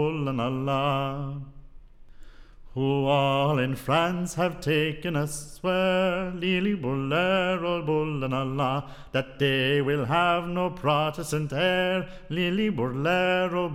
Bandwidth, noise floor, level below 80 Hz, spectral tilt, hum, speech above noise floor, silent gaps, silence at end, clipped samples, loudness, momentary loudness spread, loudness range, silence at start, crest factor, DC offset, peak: 16 kHz; -46 dBFS; -50 dBFS; -6 dB/octave; none; 20 dB; none; 0 s; under 0.1%; -26 LUFS; 7 LU; 2 LU; 0 s; 16 dB; under 0.1%; -10 dBFS